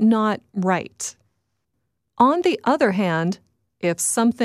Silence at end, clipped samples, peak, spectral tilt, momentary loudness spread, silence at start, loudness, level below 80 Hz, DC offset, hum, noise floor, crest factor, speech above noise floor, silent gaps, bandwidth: 0 s; under 0.1%; -2 dBFS; -5 dB/octave; 12 LU; 0 s; -21 LUFS; -66 dBFS; under 0.1%; none; -75 dBFS; 18 dB; 56 dB; none; 15 kHz